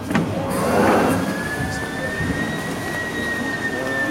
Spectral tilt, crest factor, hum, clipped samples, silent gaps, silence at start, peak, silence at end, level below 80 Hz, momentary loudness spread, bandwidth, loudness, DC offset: -5 dB/octave; 16 dB; none; under 0.1%; none; 0 s; -6 dBFS; 0 s; -42 dBFS; 8 LU; 16 kHz; -21 LUFS; under 0.1%